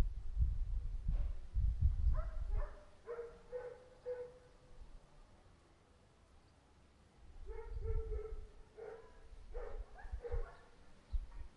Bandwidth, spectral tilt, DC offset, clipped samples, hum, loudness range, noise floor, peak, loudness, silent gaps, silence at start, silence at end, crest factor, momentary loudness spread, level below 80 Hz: 5.8 kHz; -8 dB/octave; under 0.1%; under 0.1%; none; 14 LU; -67 dBFS; -22 dBFS; -45 LUFS; none; 0 s; 0 s; 18 dB; 23 LU; -42 dBFS